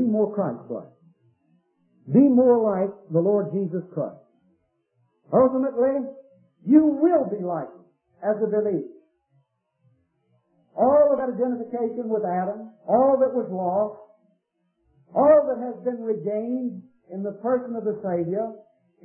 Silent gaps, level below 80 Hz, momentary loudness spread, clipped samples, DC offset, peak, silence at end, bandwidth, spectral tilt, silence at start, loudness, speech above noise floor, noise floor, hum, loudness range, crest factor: none; -68 dBFS; 16 LU; under 0.1%; under 0.1%; -4 dBFS; 0.45 s; 2.8 kHz; -14 dB/octave; 0 s; -23 LUFS; 51 dB; -73 dBFS; none; 4 LU; 20 dB